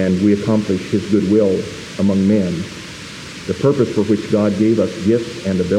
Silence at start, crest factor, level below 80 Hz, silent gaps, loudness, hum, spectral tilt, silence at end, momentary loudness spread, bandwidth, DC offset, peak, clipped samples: 0 s; 14 dB; -50 dBFS; none; -17 LUFS; none; -7 dB/octave; 0 s; 13 LU; 11.5 kHz; under 0.1%; -2 dBFS; under 0.1%